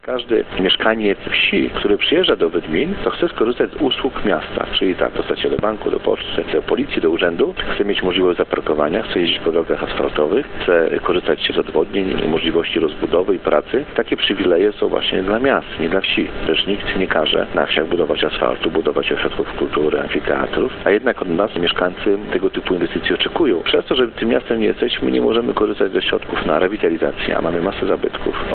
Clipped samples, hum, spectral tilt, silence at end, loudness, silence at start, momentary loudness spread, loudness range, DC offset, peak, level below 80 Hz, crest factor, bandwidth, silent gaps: under 0.1%; none; -9.5 dB/octave; 0 s; -18 LUFS; 0.05 s; 4 LU; 2 LU; under 0.1%; 0 dBFS; -38 dBFS; 18 dB; 4.5 kHz; none